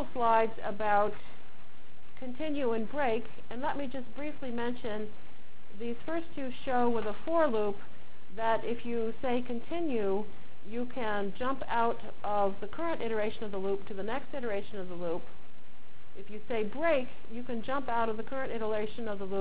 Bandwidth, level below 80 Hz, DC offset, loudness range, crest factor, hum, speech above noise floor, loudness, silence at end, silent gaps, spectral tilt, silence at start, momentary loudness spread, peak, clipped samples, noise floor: 4 kHz; -60 dBFS; 4%; 4 LU; 20 dB; none; 25 dB; -34 LUFS; 0 s; none; -9 dB/octave; 0 s; 13 LU; -16 dBFS; under 0.1%; -58 dBFS